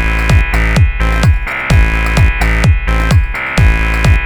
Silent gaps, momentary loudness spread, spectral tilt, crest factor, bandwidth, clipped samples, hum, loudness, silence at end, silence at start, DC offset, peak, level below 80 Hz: none; 2 LU; -6 dB/octave; 10 dB; 14.5 kHz; under 0.1%; none; -12 LUFS; 0 s; 0 s; under 0.1%; 0 dBFS; -12 dBFS